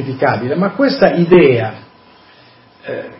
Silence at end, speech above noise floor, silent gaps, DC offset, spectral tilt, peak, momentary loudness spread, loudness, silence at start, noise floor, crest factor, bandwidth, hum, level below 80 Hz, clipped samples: 0.05 s; 32 dB; none; under 0.1%; -11.5 dB/octave; 0 dBFS; 17 LU; -12 LUFS; 0 s; -45 dBFS; 14 dB; 5.8 kHz; none; -50 dBFS; under 0.1%